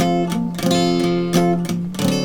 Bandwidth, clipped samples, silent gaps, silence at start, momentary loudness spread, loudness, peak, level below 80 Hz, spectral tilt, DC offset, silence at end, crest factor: 19 kHz; under 0.1%; none; 0 s; 5 LU; -19 LUFS; -4 dBFS; -48 dBFS; -5.5 dB/octave; under 0.1%; 0 s; 14 dB